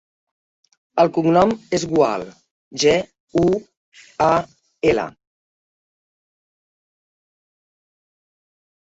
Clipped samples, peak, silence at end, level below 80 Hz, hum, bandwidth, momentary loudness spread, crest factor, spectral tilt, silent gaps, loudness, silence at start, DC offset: under 0.1%; -2 dBFS; 3.7 s; -52 dBFS; none; 8 kHz; 15 LU; 20 dB; -5 dB/octave; 2.51-2.71 s, 3.20-3.27 s, 3.77-3.92 s; -19 LUFS; 0.95 s; under 0.1%